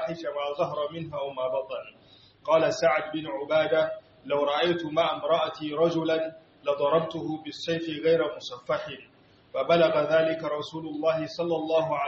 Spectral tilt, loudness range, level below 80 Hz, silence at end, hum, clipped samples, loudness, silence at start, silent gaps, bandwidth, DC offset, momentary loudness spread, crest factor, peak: -3.5 dB/octave; 2 LU; -68 dBFS; 0 s; none; under 0.1%; -27 LUFS; 0 s; none; 7.2 kHz; under 0.1%; 11 LU; 18 dB; -10 dBFS